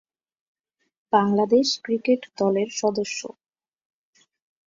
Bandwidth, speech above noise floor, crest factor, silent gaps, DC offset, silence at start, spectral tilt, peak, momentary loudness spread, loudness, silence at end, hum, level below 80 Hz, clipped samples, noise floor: 7.8 kHz; 43 dB; 20 dB; none; under 0.1%; 1.1 s; -4.5 dB/octave; -6 dBFS; 10 LU; -23 LUFS; 1.4 s; none; -70 dBFS; under 0.1%; -65 dBFS